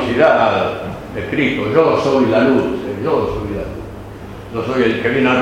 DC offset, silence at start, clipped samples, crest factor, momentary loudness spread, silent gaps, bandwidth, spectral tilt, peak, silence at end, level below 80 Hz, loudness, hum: under 0.1%; 0 s; under 0.1%; 16 dB; 15 LU; none; 15 kHz; -6.5 dB/octave; 0 dBFS; 0 s; -38 dBFS; -16 LUFS; none